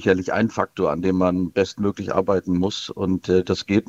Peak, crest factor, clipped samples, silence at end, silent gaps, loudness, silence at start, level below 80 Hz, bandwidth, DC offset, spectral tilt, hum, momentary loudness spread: -2 dBFS; 18 dB; under 0.1%; 0.05 s; none; -22 LUFS; 0 s; -54 dBFS; 8 kHz; under 0.1%; -6.5 dB/octave; none; 4 LU